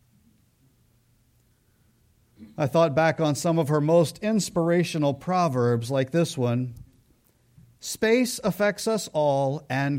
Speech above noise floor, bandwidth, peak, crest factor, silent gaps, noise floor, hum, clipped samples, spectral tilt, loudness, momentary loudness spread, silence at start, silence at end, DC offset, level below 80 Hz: 40 dB; 16.5 kHz; -8 dBFS; 16 dB; none; -64 dBFS; none; under 0.1%; -5.5 dB/octave; -24 LUFS; 6 LU; 2.4 s; 0 s; under 0.1%; -62 dBFS